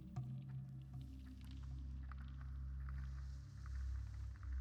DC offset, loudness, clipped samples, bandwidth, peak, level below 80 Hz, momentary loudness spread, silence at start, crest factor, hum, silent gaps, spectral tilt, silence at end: under 0.1%; -51 LUFS; under 0.1%; 7.4 kHz; -36 dBFS; -50 dBFS; 5 LU; 0 s; 12 dB; none; none; -7.5 dB/octave; 0 s